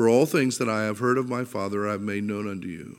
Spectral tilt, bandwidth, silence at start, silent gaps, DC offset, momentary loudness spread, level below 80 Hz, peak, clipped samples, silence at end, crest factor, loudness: -5.5 dB/octave; 17 kHz; 0 s; none; under 0.1%; 9 LU; -68 dBFS; -8 dBFS; under 0.1%; 0.05 s; 18 dB; -26 LUFS